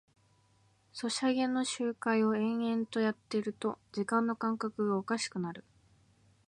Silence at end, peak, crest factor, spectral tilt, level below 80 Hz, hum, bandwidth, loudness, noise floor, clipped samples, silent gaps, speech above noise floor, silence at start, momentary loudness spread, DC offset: 0.9 s; -16 dBFS; 18 dB; -4.5 dB/octave; -78 dBFS; none; 11 kHz; -33 LUFS; -69 dBFS; under 0.1%; none; 36 dB; 0.95 s; 8 LU; under 0.1%